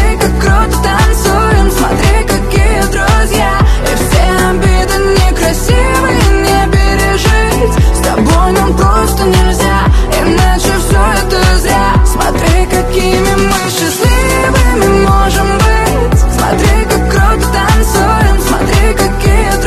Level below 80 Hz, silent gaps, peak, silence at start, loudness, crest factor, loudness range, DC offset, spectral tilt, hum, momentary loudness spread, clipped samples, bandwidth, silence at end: -12 dBFS; none; 0 dBFS; 0 s; -10 LUFS; 8 dB; 1 LU; under 0.1%; -5 dB/octave; none; 2 LU; under 0.1%; 14 kHz; 0 s